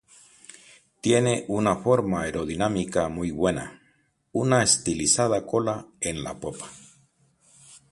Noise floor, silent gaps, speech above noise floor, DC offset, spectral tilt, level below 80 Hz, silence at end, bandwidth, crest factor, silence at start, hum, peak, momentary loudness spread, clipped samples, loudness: -66 dBFS; none; 42 dB; under 0.1%; -4 dB/octave; -52 dBFS; 0.15 s; 11.5 kHz; 22 dB; 1.05 s; none; -4 dBFS; 13 LU; under 0.1%; -24 LUFS